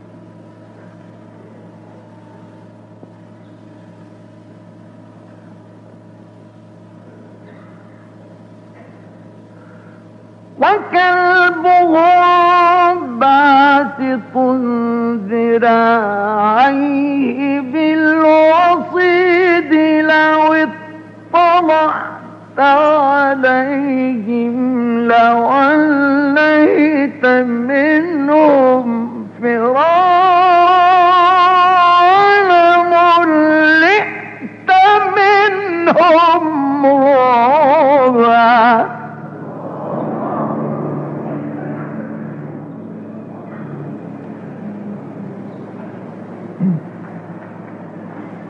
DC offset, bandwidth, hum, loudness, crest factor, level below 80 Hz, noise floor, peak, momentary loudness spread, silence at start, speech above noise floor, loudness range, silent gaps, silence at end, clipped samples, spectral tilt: under 0.1%; 7.2 kHz; none; -11 LUFS; 12 dB; -68 dBFS; -39 dBFS; 0 dBFS; 21 LU; 0.85 s; 27 dB; 17 LU; none; 0 s; under 0.1%; -6.5 dB/octave